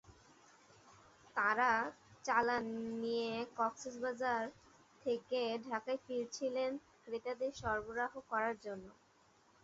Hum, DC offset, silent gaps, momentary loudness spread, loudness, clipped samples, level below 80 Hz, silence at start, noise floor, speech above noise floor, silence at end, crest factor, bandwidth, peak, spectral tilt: none; under 0.1%; none; 11 LU; -39 LUFS; under 0.1%; -70 dBFS; 0.1 s; -70 dBFS; 31 dB; 0.7 s; 22 dB; 7.6 kHz; -18 dBFS; -2 dB/octave